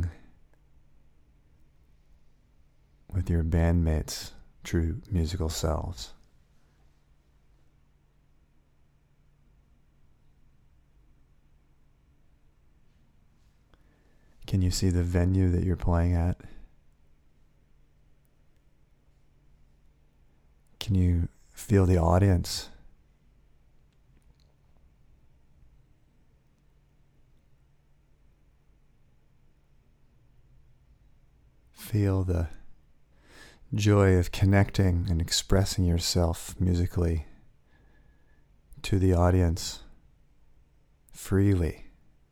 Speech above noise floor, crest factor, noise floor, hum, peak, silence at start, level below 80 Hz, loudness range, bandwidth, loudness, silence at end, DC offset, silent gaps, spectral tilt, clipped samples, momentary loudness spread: 38 dB; 22 dB; -63 dBFS; none; -8 dBFS; 0 s; -42 dBFS; 10 LU; 15.5 kHz; -27 LUFS; 0.4 s; under 0.1%; none; -6 dB/octave; under 0.1%; 17 LU